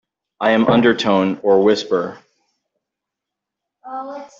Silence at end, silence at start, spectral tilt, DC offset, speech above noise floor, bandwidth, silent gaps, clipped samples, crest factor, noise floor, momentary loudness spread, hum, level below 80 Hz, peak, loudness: 0.15 s; 0.4 s; -6 dB/octave; under 0.1%; 68 dB; 7.6 kHz; none; under 0.1%; 16 dB; -83 dBFS; 16 LU; none; -60 dBFS; -2 dBFS; -16 LUFS